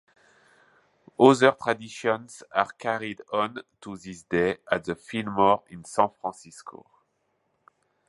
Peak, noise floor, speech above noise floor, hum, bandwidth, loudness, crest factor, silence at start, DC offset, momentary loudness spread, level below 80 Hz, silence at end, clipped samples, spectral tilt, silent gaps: -2 dBFS; -73 dBFS; 48 dB; none; 11.5 kHz; -25 LUFS; 26 dB; 1.2 s; under 0.1%; 21 LU; -64 dBFS; 1.4 s; under 0.1%; -5 dB/octave; none